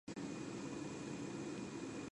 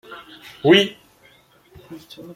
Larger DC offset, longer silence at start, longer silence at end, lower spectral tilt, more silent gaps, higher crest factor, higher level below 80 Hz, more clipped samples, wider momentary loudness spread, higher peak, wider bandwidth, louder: neither; about the same, 0.05 s vs 0.1 s; about the same, 0 s vs 0.05 s; about the same, -5 dB/octave vs -5 dB/octave; neither; second, 12 dB vs 20 dB; second, -72 dBFS vs -62 dBFS; neither; second, 1 LU vs 27 LU; second, -34 dBFS vs -2 dBFS; second, 11 kHz vs 15 kHz; second, -47 LUFS vs -17 LUFS